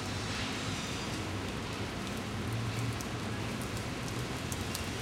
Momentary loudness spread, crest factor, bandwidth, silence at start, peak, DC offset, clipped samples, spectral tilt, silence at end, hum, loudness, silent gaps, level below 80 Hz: 2 LU; 22 dB; 16.5 kHz; 0 s; -14 dBFS; under 0.1%; under 0.1%; -4.5 dB/octave; 0 s; none; -36 LUFS; none; -50 dBFS